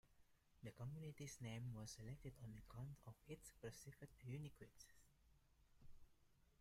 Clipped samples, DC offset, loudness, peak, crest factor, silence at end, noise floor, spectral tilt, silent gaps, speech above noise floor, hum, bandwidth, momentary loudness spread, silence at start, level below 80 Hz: under 0.1%; under 0.1%; -57 LUFS; -42 dBFS; 16 dB; 0.05 s; -76 dBFS; -5.5 dB/octave; none; 20 dB; none; 16 kHz; 9 LU; 0.05 s; -72 dBFS